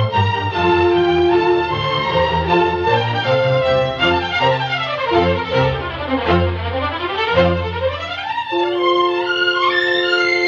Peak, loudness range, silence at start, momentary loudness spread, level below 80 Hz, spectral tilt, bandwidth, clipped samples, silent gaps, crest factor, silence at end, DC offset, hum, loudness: -2 dBFS; 2 LU; 0 s; 6 LU; -38 dBFS; -6.5 dB/octave; 7.2 kHz; under 0.1%; none; 14 dB; 0 s; under 0.1%; none; -16 LUFS